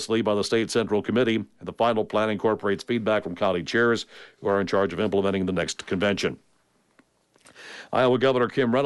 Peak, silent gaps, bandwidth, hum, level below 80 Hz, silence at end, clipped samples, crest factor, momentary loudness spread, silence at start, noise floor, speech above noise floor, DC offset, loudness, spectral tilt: -10 dBFS; none; 11.5 kHz; none; -62 dBFS; 0 s; under 0.1%; 14 dB; 7 LU; 0 s; -66 dBFS; 42 dB; under 0.1%; -24 LUFS; -5 dB/octave